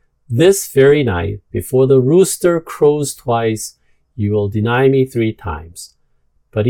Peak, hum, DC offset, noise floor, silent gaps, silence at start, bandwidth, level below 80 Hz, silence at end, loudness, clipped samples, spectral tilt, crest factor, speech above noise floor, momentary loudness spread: 0 dBFS; none; under 0.1%; -58 dBFS; none; 0.3 s; 17.5 kHz; -44 dBFS; 0 s; -15 LUFS; under 0.1%; -6 dB/octave; 14 dB; 44 dB; 14 LU